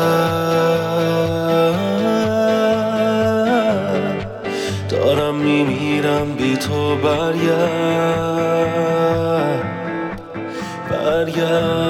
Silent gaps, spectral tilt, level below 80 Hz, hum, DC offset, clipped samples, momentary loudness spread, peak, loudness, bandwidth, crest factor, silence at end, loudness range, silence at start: none; -6 dB/octave; -48 dBFS; none; under 0.1%; under 0.1%; 8 LU; -4 dBFS; -18 LUFS; 17.5 kHz; 12 dB; 0 s; 3 LU; 0 s